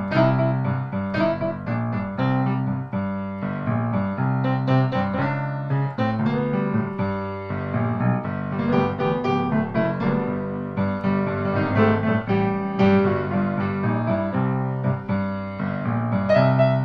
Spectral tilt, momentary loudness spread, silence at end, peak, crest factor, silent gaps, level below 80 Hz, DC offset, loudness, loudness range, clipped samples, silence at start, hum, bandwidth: -9.5 dB/octave; 7 LU; 0 s; -6 dBFS; 16 dB; none; -48 dBFS; under 0.1%; -23 LUFS; 3 LU; under 0.1%; 0 s; none; 6 kHz